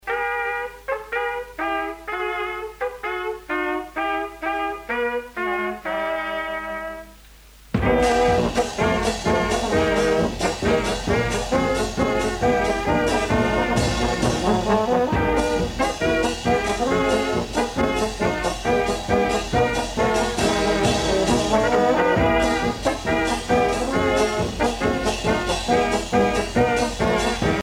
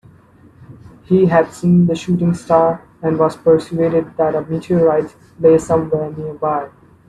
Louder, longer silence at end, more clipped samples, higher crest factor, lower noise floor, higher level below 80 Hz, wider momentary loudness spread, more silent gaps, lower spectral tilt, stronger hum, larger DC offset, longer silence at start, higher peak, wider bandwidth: second, -22 LUFS vs -16 LUFS; second, 0 s vs 0.4 s; neither; about the same, 16 dB vs 16 dB; about the same, -47 dBFS vs -46 dBFS; first, -36 dBFS vs -50 dBFS; about the same, 7 LU vs 9 LU; neither; second, -4.5 dB/octave vs -8 dB/octave; neither; neither; second, 0.05 s vs 0.6 s; second, -6 dBFS vs 0 dBFS; first, 17 kHz vs 10.5 kHz